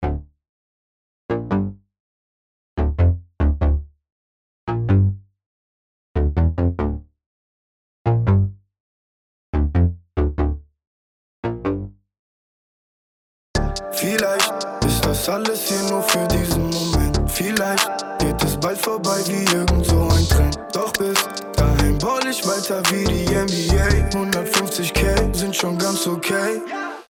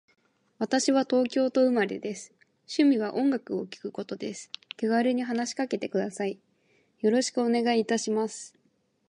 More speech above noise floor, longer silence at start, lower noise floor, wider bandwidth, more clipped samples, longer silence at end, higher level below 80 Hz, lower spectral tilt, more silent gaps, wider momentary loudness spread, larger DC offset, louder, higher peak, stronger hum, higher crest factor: first, over 71 dB vs 44 dB; second, 0 s vs 0.6 s; first, under -90 dBFS vs -70 dBFS; first, 18.5 kHz vs 11 kHz; neither; second, 0.05 s vs 0.6 s; first, -26 dBFS vs -80 dBFS; about the same, -4.5 dB/octave vs -4 dB/octave; first, 0.49-1.29 s, 2.00-2.77 s, 4.12-4.67 s, 5.46-6.15 s, 7.26-8.05 s, 8.80-9.53 s, 10.87-11.43 s, 12.19-13.54 s vs none; second, 9 LU vs 13 LU; neither; first, -20 LUFS vs -27 LUFS; first, -4 dBFS vs -10 dBFS; neither; about the same, 16 dB vs 18 dB